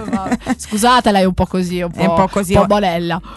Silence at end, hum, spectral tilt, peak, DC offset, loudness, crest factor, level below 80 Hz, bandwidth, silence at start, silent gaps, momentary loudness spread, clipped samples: 0 s; none; -5.5 dB/octave; 0 dBFS; under 0.1%; -15 LUFS; 14 dB; -32 dBFS; 12.5 kHz; 0 s; none; 8 LU; under 0.1%